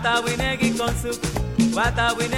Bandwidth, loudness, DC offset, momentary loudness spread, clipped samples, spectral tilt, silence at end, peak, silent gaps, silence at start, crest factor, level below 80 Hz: 16.5 kHz; -22 LUFS; 0.2%; 6 LU; under 0.1%; -4.5 dB/octave; 0 s; -8 dBFS; none; 0 s; 14 dB; -34 dBFS